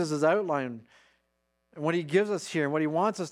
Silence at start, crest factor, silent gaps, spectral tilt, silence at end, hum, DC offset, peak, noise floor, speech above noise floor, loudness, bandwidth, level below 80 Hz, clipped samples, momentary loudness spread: 0 s; 18 dB; none; -5.5 dB/octave; 0 s; none; under 0.1%; -12 dBFS; -77 dBFS; 49 dB; -28 LUFS; 13 kHz; -80 dBFS; under 0.1%; 8 LU